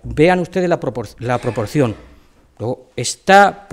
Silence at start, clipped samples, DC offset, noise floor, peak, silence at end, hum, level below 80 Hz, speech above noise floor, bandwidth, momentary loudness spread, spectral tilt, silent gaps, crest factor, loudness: 0.05 s; under 0.1%; under 0.1%; -48 dBFS; 0 dBFS; 0.1 s; none; -42 dBFS; 32 dB; 16 kHz; 15 LU; -5 dB/octave; none; 16 dB; -16 LUFS